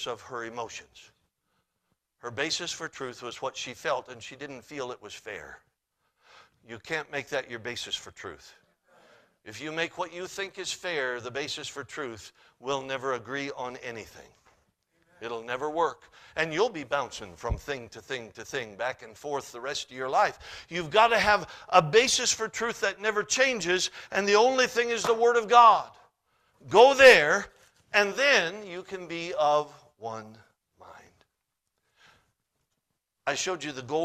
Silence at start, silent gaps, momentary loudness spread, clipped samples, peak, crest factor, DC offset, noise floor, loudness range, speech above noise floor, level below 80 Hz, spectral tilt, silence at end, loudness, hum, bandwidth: 0 s; none; 19 LU; under 0.1%; -4 dBFS; 26 dB; under 0.1%; -82 dBFS; 16 LU; 55 dB; -56 dBFS; -2.5 dB/octave; 0 s; -26 LUFS; none; 14.5 kHz